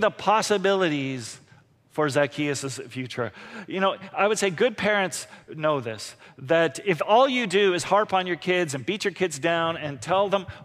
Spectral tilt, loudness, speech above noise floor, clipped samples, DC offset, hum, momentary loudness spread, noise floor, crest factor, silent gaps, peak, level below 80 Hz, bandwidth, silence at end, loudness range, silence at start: -4 dB/octave; -24 LUFS; 32 dB; under 0.1%; under 0.1%; none; 13 LU; -56 dBFS; 16 dB; none; -8 dBFS; -66 dBFS; 15.5 kHz; 0 s; 4 LU; 0 s